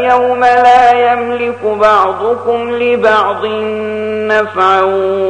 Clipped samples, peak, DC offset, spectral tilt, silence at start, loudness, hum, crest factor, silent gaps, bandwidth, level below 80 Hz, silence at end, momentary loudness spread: under 0.1%; 0 dBFS; under 0.1%; -5 dB/octave; 0 s; -11 LUFS; none; 10 dB; none; 9.4 kHz; -50 dBFS; 0 s; 10 LU